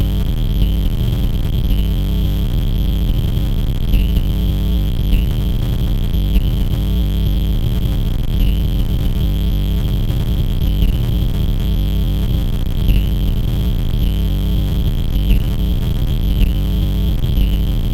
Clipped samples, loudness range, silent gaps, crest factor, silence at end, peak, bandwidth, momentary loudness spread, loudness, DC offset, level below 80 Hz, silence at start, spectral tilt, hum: under 0.1%; 0 LU; none; 14 dB; 0 s; -2 dBFS; 16.5 kHz; 2 LU; -18 LUFS; under 0.1%; -16 dBFS; 0 s; -7.5 dB/octave; none